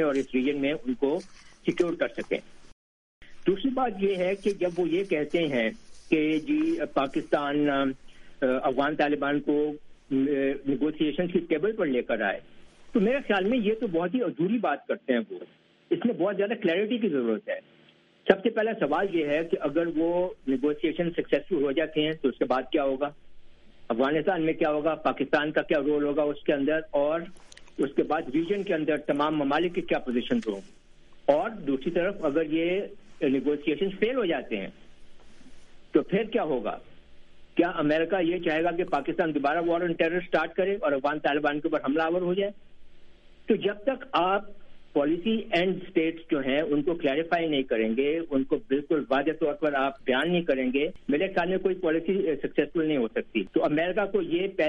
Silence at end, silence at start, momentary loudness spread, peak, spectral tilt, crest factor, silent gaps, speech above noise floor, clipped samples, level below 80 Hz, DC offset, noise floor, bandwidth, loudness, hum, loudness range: 0 s; 0 s; 5 LU; -2 dBFS; -7 dB/octave; 24 dB; 2.72-3.21 s; 33 dB; under 0.1%; -54 dBFS; under 0.1%; -59 dBFS; 10.5 kHz; -27 LUFS; none; 3 LU